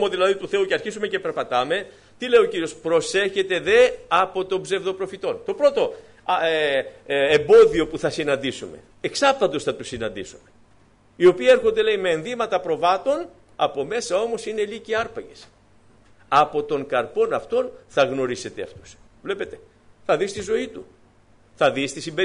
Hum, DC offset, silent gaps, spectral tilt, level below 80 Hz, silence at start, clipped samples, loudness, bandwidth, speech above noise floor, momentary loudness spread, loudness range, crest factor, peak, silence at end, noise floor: none; under 0.1%; none; -4 dB/octave; -54 dBFS; 0 s; under 0.1%; -21 LUFS; 10.5 kHz; 34 dB; 14 LU; 7 LU; 16 dB; -6 dBFS; 0 s; -55 dBFS